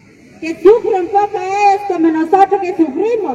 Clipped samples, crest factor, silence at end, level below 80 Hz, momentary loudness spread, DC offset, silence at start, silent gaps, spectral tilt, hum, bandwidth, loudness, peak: under 0.1%; 14 dB; 0 s; -52 dBFS; 6 LU; under 0.1%; 0.4 s; none; -5.5 dB/octave; none; 9.2 kHz; -13 LUFS; 0 dBFS